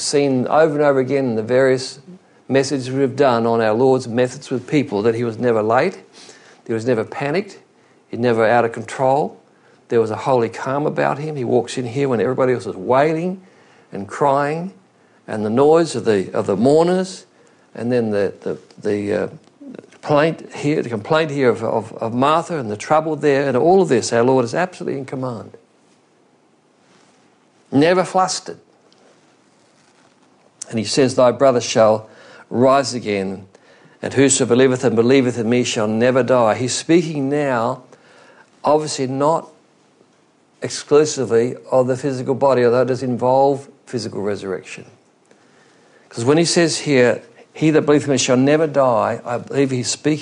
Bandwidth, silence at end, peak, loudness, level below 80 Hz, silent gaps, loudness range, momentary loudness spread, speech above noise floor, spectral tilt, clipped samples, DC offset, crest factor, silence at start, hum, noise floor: 11 kHz; 0 s; -2 dBFS; -18 LUFS; -66 dBFS; none; 5 LU; 12 LU; 39 dB; -5 dB/octave; under 0.1%; under 0.1%; 16 dB; 0 s; none; -56 dBFS